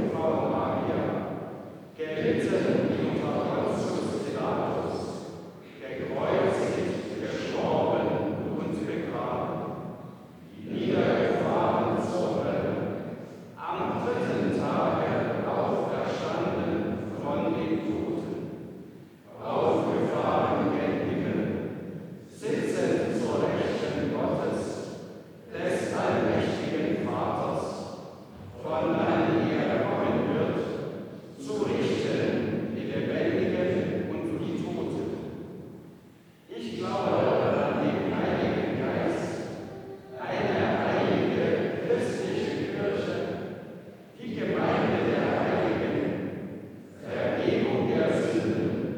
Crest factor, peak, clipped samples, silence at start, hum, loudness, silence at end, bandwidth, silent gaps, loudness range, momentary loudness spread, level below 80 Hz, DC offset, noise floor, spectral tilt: 16 dB; -12 dBFS; under 0.1%; 0 s; none; -28 LUFS; 0 s; 19.5 kHz; none; 2 LU; 15 LU; -62 dBFS; under 0.1%; -54 dBFS; -7 dB/octave